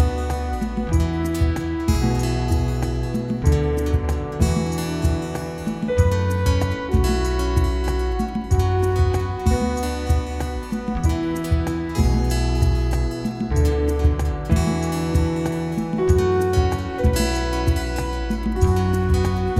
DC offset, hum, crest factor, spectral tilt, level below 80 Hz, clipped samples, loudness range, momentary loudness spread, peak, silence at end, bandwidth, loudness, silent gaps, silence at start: under 0.1%; none; 16 dB; -6.5 dB/octave; -24 dBFS; under 0.1%; 2 LU; 6 LU; -4 dBFS; 0 s; 15 kHz; -22 LUFS; none; 0 s